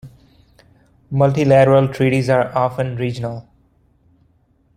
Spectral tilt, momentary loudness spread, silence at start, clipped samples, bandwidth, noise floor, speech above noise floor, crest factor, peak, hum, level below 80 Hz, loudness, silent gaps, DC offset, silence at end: -7.5 dB/octave; 14 LU; 0.05 s; under 0.1%; 10 kHz; -58 dBFS; 43 dB; 16 dB; -2 dBFS; none; -52 dBFS; -16 LUFS; none; under 0.1%; 1.35 s